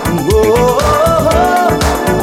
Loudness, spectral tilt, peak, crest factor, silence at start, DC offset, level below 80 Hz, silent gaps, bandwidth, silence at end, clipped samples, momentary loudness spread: -11 LUFS; -5 dB/octave; 0 dBFS; 10 dB; 0 s; under 0.1%; -22 dBFS; none; 17 kHz; 0 s; under 0.1%; 2 LU